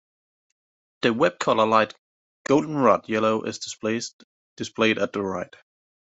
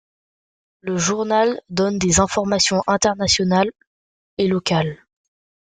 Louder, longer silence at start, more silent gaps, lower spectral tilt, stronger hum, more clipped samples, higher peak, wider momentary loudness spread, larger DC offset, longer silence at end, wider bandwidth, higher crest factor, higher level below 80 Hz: second, -23 LUFS vs -19 LUFS; first, 1 s vs 0.85 s; first, 1.99-2.45 s, 4.13-4.56 s vs 3.87-4.37 s; about the same, -4.5 dB/octave vs -4 dB/octave; neither; neither; about the same, -4 dBFS vs -2 dBFS; first, 14 LU vs 8 LU; neither; about the same, 0.7 s vs 0.65 s; second, 8.2 kHz vs 9.6 kHz; about the same, 20 dB vs 18 dB; second, -66 dBFS vs -46 dBFS